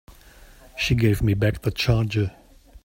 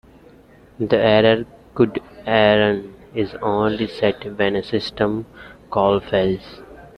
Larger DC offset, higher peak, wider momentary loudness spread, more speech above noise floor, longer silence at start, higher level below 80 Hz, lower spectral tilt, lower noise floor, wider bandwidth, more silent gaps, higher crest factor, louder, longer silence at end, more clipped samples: neither; second, -6 dBFS vs -2 dBFS; second, 8 LU vs 14 LU; about the same, 27 dB vs 29 dB; about the same, 0.75 s vs 0.8 s; first, -38 dBFS vs -48 dBFS; second, -6 dB/octave vs -7.5 dB/octave; about the same, -48 dBFS vs -48 dBFS; first, 16.5 kHz vs 9.6 kHz; neither; about the same, 18 dB vs 18 dB; second, -23 LUFS vs -19 LUFS; first, 0.55 s vs 0.15 s; neither